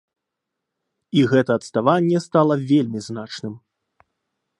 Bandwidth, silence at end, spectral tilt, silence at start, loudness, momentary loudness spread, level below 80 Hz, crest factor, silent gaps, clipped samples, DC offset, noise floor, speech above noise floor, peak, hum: 11 kHz; 1 s; -7 dB/octave; 1.15 s; -19 LUFS; 14 LU; -66 dBFS; 20 dB; none; under 0.1%; under 0.1%; -82 dBFS; 63 dB; -2 dBFS; none